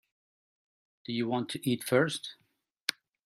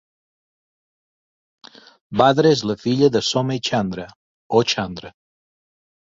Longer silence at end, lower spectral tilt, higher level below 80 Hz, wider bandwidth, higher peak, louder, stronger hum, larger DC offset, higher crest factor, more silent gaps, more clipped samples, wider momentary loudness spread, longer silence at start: second, 0.35 s vs 1.05 s; about the same, -4.5 dB/octave vs -5 dB/octave; second, -76 dBFS vs -56 dBFS; first, 16 kHz vs 7.8 kHz; about the same, -4 dBFS vs -2 dBFS; second, -32 LUFS vs -19 LUFS; neither; neither; first, 30 dB vs 20 dB; second, 2.82-2.86 s vs 4.16-4.50 s; neither; second, 11 LU vs 14 LU; second, 1.1 s vs 2.1 s